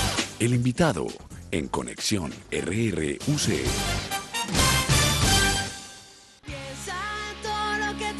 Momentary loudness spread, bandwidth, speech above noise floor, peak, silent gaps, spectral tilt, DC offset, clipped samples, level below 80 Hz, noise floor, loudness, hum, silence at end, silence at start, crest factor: 15 LU; 12.5 kHz; 24 dB; -6 dBFS; none; -3.5 dB/octave; under 0.1%; under 0.1%; -38 dBFS; -49 dBFS; -25 LUFS; none; 0 s; 0 s; 20 dB